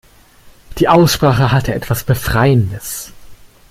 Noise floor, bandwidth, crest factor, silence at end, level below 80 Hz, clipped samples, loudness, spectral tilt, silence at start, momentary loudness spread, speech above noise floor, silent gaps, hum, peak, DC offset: -44 dBFS; 16.5 kHz; 14 dB; 0.35 s; -34 dBFS; under 0.1%; -14 LUFS; -5.5 dB/octave; 0.7 s; 15 LU; 31 dB; none; none; 0 dBFS; under 0.1%